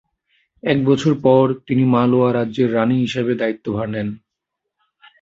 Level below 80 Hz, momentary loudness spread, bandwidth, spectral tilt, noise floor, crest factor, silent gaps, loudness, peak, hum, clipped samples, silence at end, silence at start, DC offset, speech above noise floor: -54 dBFS; 10 LU; 7.8 kHz; -7.5 dB/octave; -80 dBFS; 16 dB; none; -18 LUFS; -2 dBFS; none; under 0.1%; 1.05 s; 0.65 s; under 0.1%; 63 dB